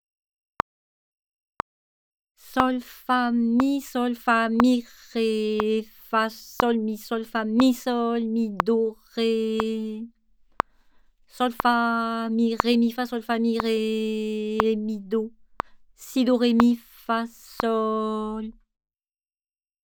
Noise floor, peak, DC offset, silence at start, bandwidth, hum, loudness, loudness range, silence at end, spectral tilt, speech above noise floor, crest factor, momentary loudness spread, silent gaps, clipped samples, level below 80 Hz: under -90 dBFS; 0 dBFS; under 0.1%; 2.45 s; over 20 kHz; none; -24 LUFS; 4 LU; 1.3 s; -5.5 dB/octave; over 66 dB; 26 dB; 12 LU; none; under 0.1%; -56 dBFS